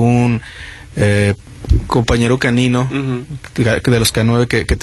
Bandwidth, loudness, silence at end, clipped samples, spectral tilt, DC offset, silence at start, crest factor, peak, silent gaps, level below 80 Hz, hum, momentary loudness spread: 12.5 kHz; -15 LUFS; 0 s; under 0.1%; -5.5 dB/octave; under 0.1%; 0 s; 14 dB; 0 dBFS; none; -26 dBFS; none; 12 LU